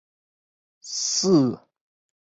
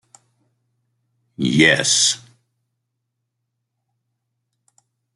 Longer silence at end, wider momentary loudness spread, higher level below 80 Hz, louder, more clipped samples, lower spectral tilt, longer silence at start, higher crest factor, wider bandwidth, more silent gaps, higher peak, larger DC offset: second, 0.7 s vs 3 s; about the same, 14 LU vs 12 LU; second, -66 dBFS vs -60 dBFS; second, -22 LUFS vs -15 LUFS; neither; first, -4.5 dB/octave vs -2.5 dB/octave; second, 0.85 s vs 1.4 s; second, 18 dB vs 24 dB; second, 8.2 kHz vs 12 kHz; neither; second, -8 dBFS vs 0 dBFS; neither